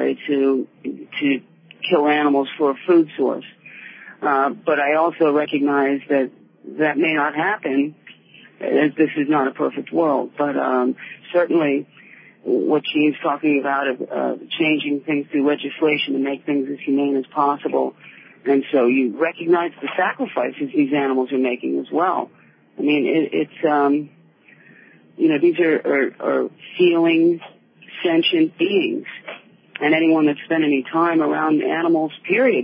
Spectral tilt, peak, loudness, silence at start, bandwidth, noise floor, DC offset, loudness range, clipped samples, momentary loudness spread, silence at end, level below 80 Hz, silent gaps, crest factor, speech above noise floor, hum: -10.5 dB/octave; -4 dBFS; -19 LUFS; 0 s; 5.2 kHz; -51 dBFS; under 0.1%; 2 LU; under 0.1%; 9 LU; 0 s; -82 dBFS; none; 16 dB; 32 dB; none